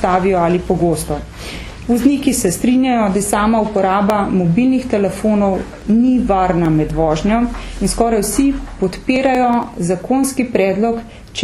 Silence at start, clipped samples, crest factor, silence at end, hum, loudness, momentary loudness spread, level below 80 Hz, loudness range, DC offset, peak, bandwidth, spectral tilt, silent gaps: 0 s; under 0.1%; 14 dB; 0 s; none; -15 LUFS; 8 LU; -32 dBFS; 2 LU; under 0.1%; 0 dBFS; 13.5 kHz; -5.5 dB/octave; none